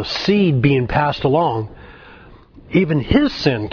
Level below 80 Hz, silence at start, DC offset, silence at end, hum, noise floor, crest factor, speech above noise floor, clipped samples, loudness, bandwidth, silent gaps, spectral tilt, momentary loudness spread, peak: -36 dBFS; 0 s; under 0.1%; 0 s; none; -43 dBFS; 18 dB; 26 dB; under 0.1%; -17 LUFS; 5.4 kHz; none; -7.5 dB/octave; 6 LU; 0 dBFS